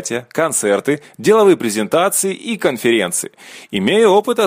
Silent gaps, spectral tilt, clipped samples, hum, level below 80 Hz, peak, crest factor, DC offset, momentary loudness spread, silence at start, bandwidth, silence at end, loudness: none; -3.5 dB/octave; under 0.1%; none; -62 dBFS; -2 dBFS; 14 dB; under 0.1%; 10 LU; 0 s; 15.5 kHz; 0 s; -15 LUFS